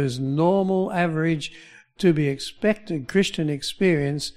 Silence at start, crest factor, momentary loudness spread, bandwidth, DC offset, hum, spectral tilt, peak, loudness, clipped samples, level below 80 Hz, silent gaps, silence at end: 0 s; 16 dB; 6 LU; 14.5 kHz; under 0.1%; none; -6 dB/octave; -6 dBFS; -23 LUFS; under 0.1%; -52 dBFS; none; 0.05 s